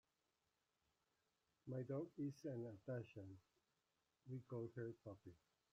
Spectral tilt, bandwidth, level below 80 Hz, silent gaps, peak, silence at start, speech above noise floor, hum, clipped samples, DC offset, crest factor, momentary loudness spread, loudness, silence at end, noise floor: -9 dB/octave; 8 kHz; -88 dBFS; none; -38 dBFS; 1.65 s; 38 dB; none; under 0.1%; under 0.1%; 16 dB; 14 LU; -53 LUFS; 0.35 s; -90 dBFS